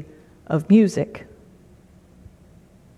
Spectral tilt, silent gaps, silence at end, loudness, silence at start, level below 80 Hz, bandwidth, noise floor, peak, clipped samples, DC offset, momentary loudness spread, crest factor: -8 dB/octave; none; 1.8 s; -19 LUFS; 0 s; -56 dBFS; 11.5 kHz; -51 dBFS; -4 dBFS; under 0.1%; under 0.1%; 16 LU; 18 dB